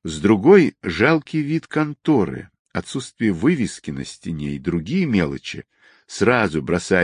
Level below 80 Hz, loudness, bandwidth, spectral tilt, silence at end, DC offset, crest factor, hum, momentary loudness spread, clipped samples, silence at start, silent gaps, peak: -44 dBFS; -20 LUFS; 10.5 kHz; -6.5 dB/octave; 0 s; under 0.1%; 18 dB; none; 16 LU; under 0.1%; 0.05 s; 2.59-2.65 s; -2 dBFS